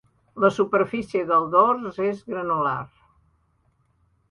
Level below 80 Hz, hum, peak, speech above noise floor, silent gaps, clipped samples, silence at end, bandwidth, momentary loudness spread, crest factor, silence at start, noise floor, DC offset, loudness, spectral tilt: -62 dBFS; none; -4 dBFS; 44 dB; none; under 0.1%; 1.45 s; 11 kHz; 11 LU; 20 dB; 0.35 s; -66 dBFS; under 0.1%; -22 LUFS; -7 dB/octave